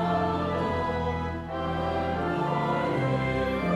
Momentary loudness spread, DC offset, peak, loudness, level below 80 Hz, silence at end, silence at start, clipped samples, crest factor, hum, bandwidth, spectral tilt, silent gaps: 4 LU; under 0.1%; -14 dBFS; -28 LUFS; -46 dBFS; 0 s; 0 s; under 0.1%; 14 dB; none; 12 kHz; -7.5 dB/octave; none